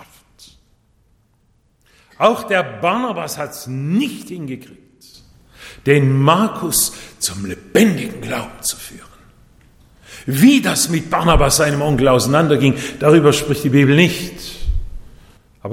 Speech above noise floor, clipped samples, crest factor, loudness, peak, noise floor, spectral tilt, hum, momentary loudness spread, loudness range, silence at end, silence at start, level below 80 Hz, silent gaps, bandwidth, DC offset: 43 dB; under 0.1%; 16 dB; -15 LUFS; 0 dBFS; -58 dBFS; -5 dB/octave; none; 16 LU; 8 LU; 0 s; 2.2 s; -32 dBFS; none; 17.5 kHz; under 0.1%